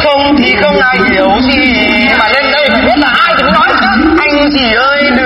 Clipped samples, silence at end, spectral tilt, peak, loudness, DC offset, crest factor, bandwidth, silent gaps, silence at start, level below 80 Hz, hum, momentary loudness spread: 0.4%; 0 s; -6 dB/octave; 0 dBFS; -7 LUFS; under 0.1%; 8 dB; 10 kHz; none; 0 s; -30 dBFS; none; 1 LU